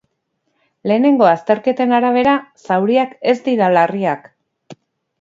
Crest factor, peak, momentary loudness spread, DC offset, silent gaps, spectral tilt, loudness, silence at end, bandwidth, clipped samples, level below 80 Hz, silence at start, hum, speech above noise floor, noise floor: 16 dB; 0 dBFS; 7 LU; under 0.1%; none; -7 dB/octave; -15 LUFS; 0.5 s; 7.6 kHz; under 0.1%; -62 dBFS; 0.85 s; none; 55 dB; -70 dBFS